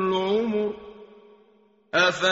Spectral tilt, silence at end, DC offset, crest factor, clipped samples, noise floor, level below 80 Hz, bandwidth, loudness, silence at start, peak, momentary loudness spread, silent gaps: -2 dB/octave; 0 s; under 0.1%; 20 dB; under 0.1%; -60 dBFS; -62 dBFS; 8 kHz; -24 LUFS; 0 s; -6 dBFS; 17 LU; none